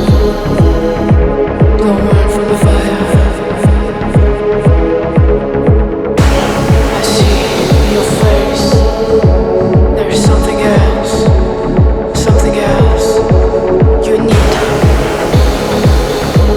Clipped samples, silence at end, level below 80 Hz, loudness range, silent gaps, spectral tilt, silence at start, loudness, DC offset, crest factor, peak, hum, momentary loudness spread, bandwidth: under 0.1%; 0 s; -14 dBFS; 1 LU; none; -6.5 dB/octave; 0 s; -10 LUFS; under 0.1%; 8 dB; 0 dBFS; none; 2 LU; 15.5 kHz